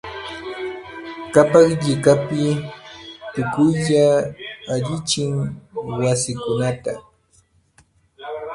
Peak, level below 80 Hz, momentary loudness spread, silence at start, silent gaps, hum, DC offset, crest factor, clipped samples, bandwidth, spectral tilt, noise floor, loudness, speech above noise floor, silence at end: 0 dBFS; -52 dBFS; 18 LU; 0.05 s; none; none; under 0.1%; 20 dB; under 0.1%; 11.5 kHz; -5.5 dB/octave; -58 dBFS; -19 LUFS; 40 dB; 0 s